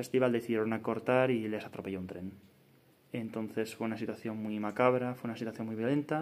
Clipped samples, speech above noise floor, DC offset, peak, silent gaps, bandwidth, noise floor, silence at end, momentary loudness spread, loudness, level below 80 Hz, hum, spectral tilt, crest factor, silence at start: under 0.1%; 31 dB; under 0.1%; -10 dBFS; none; 15.5 kHz; -64 dBFS; 0 s; 11 LU; -34 LUFS; -80 dBFS; none; -7 dB/octave; 22 dB; 0 s